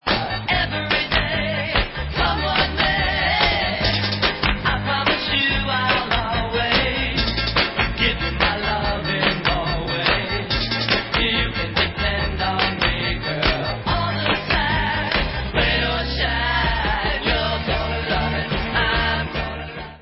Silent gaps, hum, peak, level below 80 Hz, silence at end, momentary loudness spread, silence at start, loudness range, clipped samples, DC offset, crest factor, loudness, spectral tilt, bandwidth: none; none; -4 dBFS; -30 dBFS; 0 s; 4 LU; 0.05 s; 2 LU; under 0.1%; under 0.1%; 16 dB; -20 LUFS; -8.5 dB/octave; 5.8 kHz